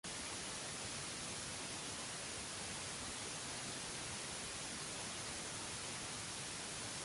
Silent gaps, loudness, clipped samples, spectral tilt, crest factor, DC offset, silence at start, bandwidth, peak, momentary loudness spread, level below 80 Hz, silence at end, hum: none; -44 LUFS; under 0.1%; -1.5 dB/octave; 12 dB; under 0.1%; 0.05 s; 11.5 kHz; -34 dBFS; 0 LU; -66 dBFS; 0 s; none